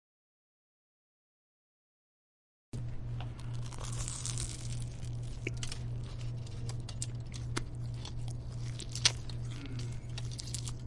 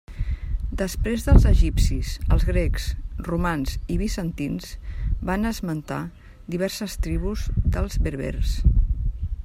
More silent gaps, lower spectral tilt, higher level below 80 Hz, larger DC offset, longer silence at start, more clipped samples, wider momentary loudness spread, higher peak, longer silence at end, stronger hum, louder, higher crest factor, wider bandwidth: neither; second, -3.5 dB/octave vs -6.5 dB/octave; second, -48 dBFS vs -24 dBFS; neither; first, 2.75 s vs 0.1 s; neither; second, 5 LU vs 11 LU; second, -8 dBFS vs 0 dBFS; about the same, 0 s vs 0 s; neither; second, -39 LUFS vs -25 LUFS; first, 32 dB vs 22 dB; second, 11.5 kHz vs 15.5 kHz